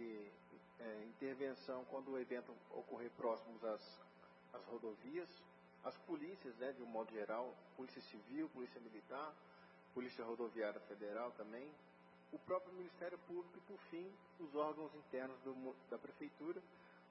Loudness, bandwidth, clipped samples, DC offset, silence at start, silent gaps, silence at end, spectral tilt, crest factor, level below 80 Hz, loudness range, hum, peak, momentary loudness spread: -50 LUFS; 5.6 kHz; under 0.1%; under 0.1%; 0 s; none; 0 s; -4 dB/octave; 20 dB; under -90 dBFS; 2 LU; none; -30 dBFS; 14 LU